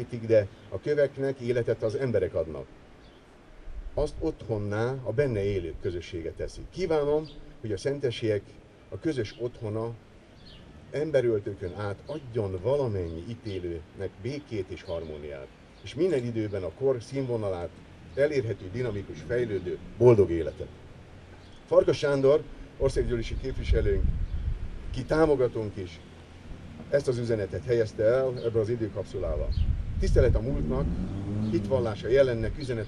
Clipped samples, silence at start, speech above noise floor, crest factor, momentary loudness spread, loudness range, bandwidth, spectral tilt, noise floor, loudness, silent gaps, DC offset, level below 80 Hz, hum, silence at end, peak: under 0.1%; 0 s; 25 dB; 22 dB; 17 LU; 6 LU; 10.5 kHz; -7.5 dB/octave; -52 dBFS; -29 LUFS; none; under 0.1%; -38 dBFS; none; 0 s; -6 dBFS